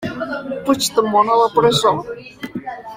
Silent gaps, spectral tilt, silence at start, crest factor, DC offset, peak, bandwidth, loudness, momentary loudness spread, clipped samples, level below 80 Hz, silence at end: none; -4 dB/octave; 0 s; 16 dB; under 0.1%; -2 dBFS; 16.5 kHz; -16 LUFS; 16 LU; under 0.1%; -52 dBFS; 0 s